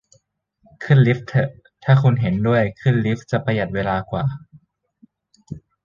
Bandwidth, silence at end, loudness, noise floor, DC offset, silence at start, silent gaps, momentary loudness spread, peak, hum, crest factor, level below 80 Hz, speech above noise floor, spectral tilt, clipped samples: 7.2 kHz; 0.25 s; -19 LUFS; -63 dBFS; under 0.1%; 0.8 s; none; 19 LU; -2 dBFS; none; 18 dB; -48 dBFS; 45 dB; -8.5 dB/octave; under 0.1%